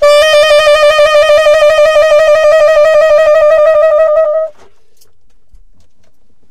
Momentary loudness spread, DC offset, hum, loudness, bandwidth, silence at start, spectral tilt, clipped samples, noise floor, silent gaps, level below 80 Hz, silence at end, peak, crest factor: 3 LU; under 0.1%; none; -6 LUFS; 14 kHz; 0 s; -0.5 dB/octave; under 0.1%; -55 dBFS; none; -40 dBFS; 0 s; 0 dBFS; 8 dB